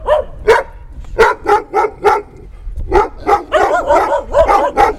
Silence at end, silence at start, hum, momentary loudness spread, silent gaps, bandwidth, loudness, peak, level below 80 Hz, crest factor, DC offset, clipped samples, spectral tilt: 0 s; 0 s; none; 7 LU; none; 15.5 kHz; -13 LUFS; 0 dBFS; -28 dBFS; 12 dB; under 0.1%; under 0.1%; -5 dB/octave